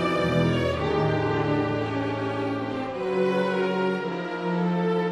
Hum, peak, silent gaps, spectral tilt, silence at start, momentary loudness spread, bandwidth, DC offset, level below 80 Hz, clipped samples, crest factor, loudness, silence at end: none; -10 dBFS; none; -7.5 dB/octave; 0 s; 6 LU; 11.5 kHz; under 0.1%; -50 dBFS; under 0.1%; 14 dB; -25 LUFS; 0 s